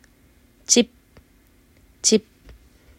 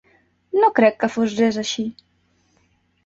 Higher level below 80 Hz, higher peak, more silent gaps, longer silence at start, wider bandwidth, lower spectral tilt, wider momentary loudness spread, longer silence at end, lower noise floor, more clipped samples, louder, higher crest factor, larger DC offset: first, -56 dBFS vs -62 dBFS; about the same, 0 dBFS vs -2 dBFS; neither; first, 0.7 s vs 0.55 s; first, 16 kHz vs 7.8 kHz; second, -2 dB/octave vs -4.5 dB/octave; about the same, 10 LU vs 10 LU; second, 0.8 s vs 1.15 s; second, -56 dBFS vs -63 dBFS; neither; about the same, -19 LUFS vs -19 LUFS; first, 26 dB vs 20 dB; neither